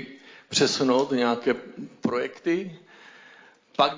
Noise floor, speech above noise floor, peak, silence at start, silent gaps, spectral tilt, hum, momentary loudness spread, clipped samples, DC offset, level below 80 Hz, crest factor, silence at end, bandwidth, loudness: -53 dBFS; 28 dB; -6 dBFS; 0 s; none; -3.5 dB/octave; none; 15 LU; under 0.1%; under 0.1%; -72 dBFS; 20 dB; 0 s; 7.6 kHz; -25 LUFS